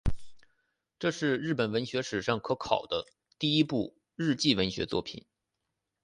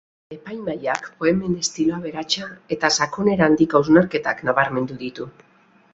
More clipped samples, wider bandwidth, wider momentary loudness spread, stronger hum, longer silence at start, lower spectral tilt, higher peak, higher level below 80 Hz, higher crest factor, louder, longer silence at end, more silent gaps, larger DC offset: neither; first, 11 kHz vs 8.2 kHz; second, 10 LU vs 15 LU; neither; second, 0.05 s vs 0.3 s; about the same, -5 dB/octave vs -4.5 dB/octave; second, -10 dBFS vs -2 dBFS; first, -48 dBFS vs -56 dBFS; about the same, 22 dB vs 20 dB; second, -30 LUFS vs -20 LUFS; first, 0.85 s vs 0.65 s; neither; neither